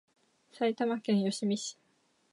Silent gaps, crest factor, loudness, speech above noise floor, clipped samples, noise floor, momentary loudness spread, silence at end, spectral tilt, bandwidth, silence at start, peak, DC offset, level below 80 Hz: none; 16 dB; -32 LUFS; 41 dB; under 0.1%; -72 dBFS; 6 LU; 0.6 s; -5 dB/octave; 11.5 kHz; 0.55 s; -16 dBFS; under 0.1%; -84 dBFS